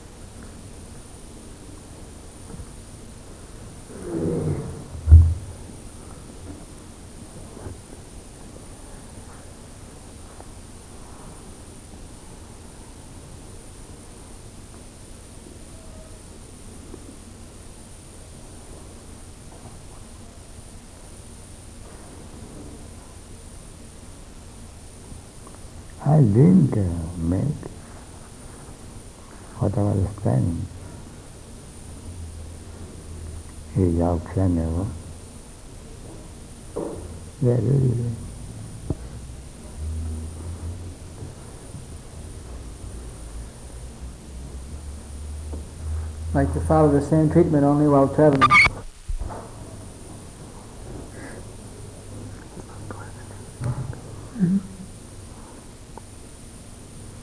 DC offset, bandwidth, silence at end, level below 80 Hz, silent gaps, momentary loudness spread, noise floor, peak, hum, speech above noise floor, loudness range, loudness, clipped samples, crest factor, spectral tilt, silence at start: 0.1%; 13.5 kHz; 0 s; -38 dBFS; none; 24 LU; -42 dBFS; 0 dBFS; none; 23 dB; 22 LU; -21 LUFS; under 0.1%; 26 dB; -7 dB/octave; 0 s